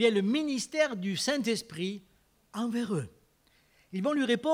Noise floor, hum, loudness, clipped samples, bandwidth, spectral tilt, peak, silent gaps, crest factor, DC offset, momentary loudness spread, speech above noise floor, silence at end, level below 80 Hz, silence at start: -67 dBFS; none; -31 LUFS; under 0.1%; 16 kHz; -4.5 dB/octave; -12 dBFS; none; 18 dB; under 0.1%; 11 LU; 38 dB; 0 s; -72 dBFS; 0 s